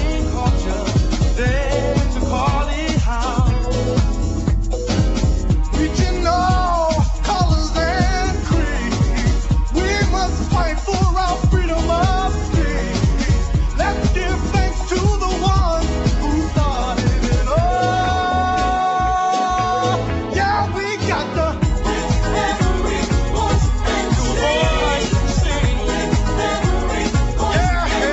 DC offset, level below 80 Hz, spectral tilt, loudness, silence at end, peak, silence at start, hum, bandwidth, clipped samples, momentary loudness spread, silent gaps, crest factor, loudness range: under 0.1%; -20 dBFS; -5.5 dB/octave; -19 LUFS; 0 s; -4 dBFS; 0 s; none; 8.2 kHz; under 0.1%; 3 LU; none; 14 dB; 1 LU